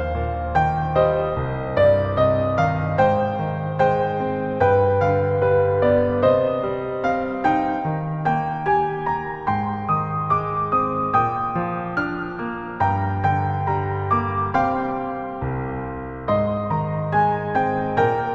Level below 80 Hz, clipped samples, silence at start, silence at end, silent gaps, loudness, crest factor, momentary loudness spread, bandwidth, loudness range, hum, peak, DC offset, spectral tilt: -40 dBFS; under 0.1%; 0 s; 0 s; none; -21 LUFS; 16 dB; 7 LU; 7 kHz; 4 LU; none; -4 dBFS; under 0.1%; -9 dB/octave